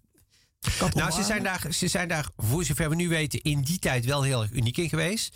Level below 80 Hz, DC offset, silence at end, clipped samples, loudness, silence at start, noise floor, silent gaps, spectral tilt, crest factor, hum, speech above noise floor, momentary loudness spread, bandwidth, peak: -44 dBFS; under 0.1%; 0.05 s; under 0.1%; -26 LUFS; 0.6 s; -64 dBFS; none; -4 dB/octave; 10 dB; none; 37 dB; 3 LU; 16.5 kHz; -16 dBFS